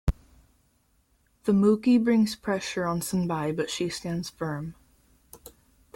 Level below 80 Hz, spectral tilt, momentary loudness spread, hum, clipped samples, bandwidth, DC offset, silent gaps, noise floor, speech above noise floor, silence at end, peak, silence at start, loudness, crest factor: -42 dBFS; -6 dB/octave; 12 LU; none; under 0.1%; 16.5 kHz; under 0.1%; none; -67 dBFS; 42 dB; 0.6 s; -10 dBFS; 0.05 s; -26 LUFS; 18 dB